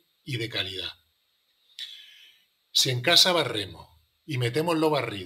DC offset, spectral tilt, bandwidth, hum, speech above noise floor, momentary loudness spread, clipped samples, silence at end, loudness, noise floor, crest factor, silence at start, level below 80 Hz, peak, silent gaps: under 0.1%; -3 dB/octave; 16 kHz; none; 45 dB; 21 LU; under 0.1%; 0 s; -24 LUFS; -71 dBFS; 24 dB; 0.25 s; -68 dBFS; -4 dBFS; none